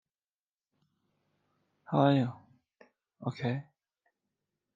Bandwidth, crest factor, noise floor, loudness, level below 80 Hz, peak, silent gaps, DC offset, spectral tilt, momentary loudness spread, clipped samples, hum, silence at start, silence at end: 7.4 kHz; 24 dB; under -90 dBFS; -31 LUFS; -82 dBFS; -12 dBFS; none; under 0.1%; -9 dB/octave; 14 LU; under 0.1%; none; 1.9 s; 1.15 s